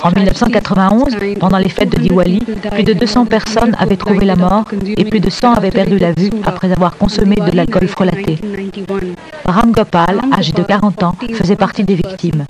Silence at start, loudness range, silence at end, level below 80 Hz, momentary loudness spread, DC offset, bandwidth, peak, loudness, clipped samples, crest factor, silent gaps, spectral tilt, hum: 0 s; 2 LU; 0 s; -28 dBFS; 7 LU; under 0.1%; 11 kHz; 0 dBFS; -12 LUFS; under 0.1%; 12 dB; none; -7 dB/octave; none